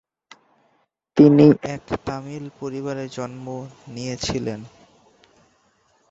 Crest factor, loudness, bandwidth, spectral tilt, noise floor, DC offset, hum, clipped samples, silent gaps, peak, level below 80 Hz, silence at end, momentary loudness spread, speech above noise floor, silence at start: 20 dB; -20 LUFS; 7.8 kHz; -7 dB/octave; -66 dBFS; under 0.1%; none; under 0.1%; none; -2 dBFS; -52 dBFS; 1.45 s; 20 LU; 46 dB; 1.15 s